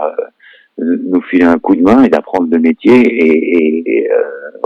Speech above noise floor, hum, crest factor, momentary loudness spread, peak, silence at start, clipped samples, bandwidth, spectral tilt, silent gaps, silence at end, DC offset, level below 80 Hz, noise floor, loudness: 34 dB; none; 10 dB; 11 LU; 0 dBFS; 0 s; under 0.1%; 6.4 kHz; -7.5 dB/octave; none; 0 s; under 0.1%; -50 dBFS; -43 dBFS; -11 LUFS